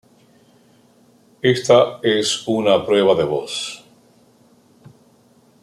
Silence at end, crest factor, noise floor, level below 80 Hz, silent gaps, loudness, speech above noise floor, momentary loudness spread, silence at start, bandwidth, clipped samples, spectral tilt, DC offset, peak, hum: 1.85 s; 18 dB; -54 dBFS; -64 dBFS; none; -17 LUFS; 37 dB; 12 LU; 1.45 s; 14 kHz; under 0.1%; -4 dB/octave; under 0.1%; -2 dBFS; none